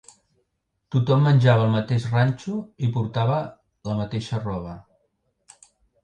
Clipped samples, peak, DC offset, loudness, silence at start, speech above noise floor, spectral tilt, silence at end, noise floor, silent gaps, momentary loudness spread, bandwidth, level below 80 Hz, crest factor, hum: under 0.1%; -4 dBFS; under 0.1%; -23 LUFS; 0.9 s; 54 dB; -8 dB/octave; 1.25 s; -75 dBFS; none; 15 LU; 9 kHz; -54 dBFS; 20 dB; none